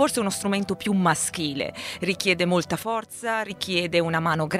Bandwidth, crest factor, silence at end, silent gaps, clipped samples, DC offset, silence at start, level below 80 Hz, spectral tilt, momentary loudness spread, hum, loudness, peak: 16 kHz; 20 dB; 0 s; none; under 0.1%; under 0.1%; 0 s; -60 dBFS; -4 dB/octave; 7 LU; none; -24 LUFS; -4 dBFS